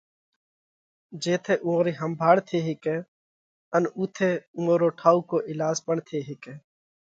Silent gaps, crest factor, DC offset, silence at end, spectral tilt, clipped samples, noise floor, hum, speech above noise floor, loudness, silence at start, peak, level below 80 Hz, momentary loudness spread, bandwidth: 3.08-3.71 s, 4.47-4.54 s; 22 dB; under 0.1%; 0.45 s; -6 dB/octave; under 0.1%; under -90 dBFS; none; over 65 dB; -25 LUFS; 1.1 s; -4 dBFS; -74 dBFS; 12 LU; 7.8 kHz